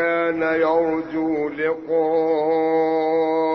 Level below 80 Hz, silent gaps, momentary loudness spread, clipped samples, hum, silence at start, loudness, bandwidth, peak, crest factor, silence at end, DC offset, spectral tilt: -60 dBFS; none; 4 LU; under 0.1%; none; 0 s; -20 LUFS; 5.8 kHz; -8 dBFS; 12 dB; 0 s; under 0.1%; -7.5 dB/octave